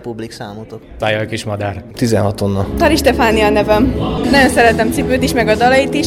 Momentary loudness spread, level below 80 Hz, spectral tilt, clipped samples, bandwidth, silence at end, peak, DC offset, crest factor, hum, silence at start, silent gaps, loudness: 16 LU; -30 dBFS; -5 dB/octave; under 0.1%; 18.5 kHz; 0 s; 0 dBFS; under 0.1%; 12 dB; none; 0 s; none; -13 LUFS